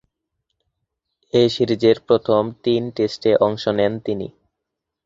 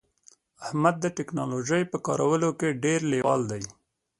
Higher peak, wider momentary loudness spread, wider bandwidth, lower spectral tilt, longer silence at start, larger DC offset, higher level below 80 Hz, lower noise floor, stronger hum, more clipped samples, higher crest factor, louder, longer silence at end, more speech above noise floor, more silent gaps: first, -2 dBFS vs -6 dBFS; about the same, 8 LU vs 9 LU; second, 7.8 kHz vs 11.5 kHz; about the same, -6.5 dB/octave vs -5.5 dB/octave; first, 1.35 s vs 0.6 s; neither; first, -56 dBFS vs -64 dBFS; first, -81 dBFS vs -60 dBFS; neither; neither; about the same, 18 dB vs 20 dB; first, -19 LUFS vs -26 LUFS; first, 0.75 s vs 0.5 s; first, 63 dB vs 34 dB; neither